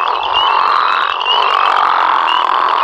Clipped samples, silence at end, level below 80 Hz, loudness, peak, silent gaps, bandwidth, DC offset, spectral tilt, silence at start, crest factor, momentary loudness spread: under 0.1%; 0 s; -54 dBFS; -12 LUFS; 0 dBFS; none; 10 kHz; under 0.1%; -1.5 dB/octave; 0 s; 12 dB; 2 LU